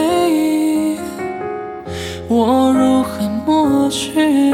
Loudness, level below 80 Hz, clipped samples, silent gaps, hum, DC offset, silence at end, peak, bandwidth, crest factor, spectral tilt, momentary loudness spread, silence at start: -16 LUFS; -46 dBFS; under 0.1%; none; none; under 0.1%; 0 s; -2 dBFS; 16.5 kHz; 12 dB; -5 dB/octave; 12 LU; 0 s